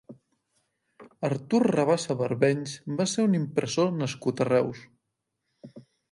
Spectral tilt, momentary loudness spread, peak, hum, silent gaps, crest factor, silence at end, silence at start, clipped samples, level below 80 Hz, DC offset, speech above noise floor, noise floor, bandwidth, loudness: -6 dB/octave; 8 LU; -8 dBFS; none; none; 20 dB; 0.3 s; 0.1 s; under 0.1%; -70 dBFS; under 0.1%; 56 dB; -81 dBFS; 11.5 kHz; -26 LUFS